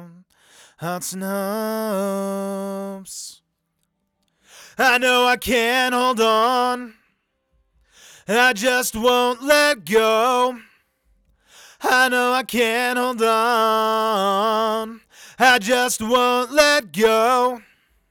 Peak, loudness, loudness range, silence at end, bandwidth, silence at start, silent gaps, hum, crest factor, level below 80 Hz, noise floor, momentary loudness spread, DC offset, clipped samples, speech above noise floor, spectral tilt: 0 dBFS; -18 LUFS; 8 LU; 0.5 s; over 20 kHz; 0 s; none; none; 20 dB; -56 dBFS; -73 dBFS; 13 LU; under 0.1%; under 0.1%; 54 dB; -2.5 dB/octave